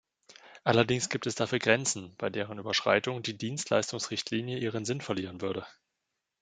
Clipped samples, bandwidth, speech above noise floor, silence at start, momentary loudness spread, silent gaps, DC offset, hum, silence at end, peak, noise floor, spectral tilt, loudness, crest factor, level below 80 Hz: under 0.1%; 9.6 kHz; 54 dB; 0.3 s; 9 LU; none; under 0.1%; none; 0.7 s; -6 dBFS; -85 dBFS; -4 dB/octave; -30 LUFS; 26 dB; -70 dBFS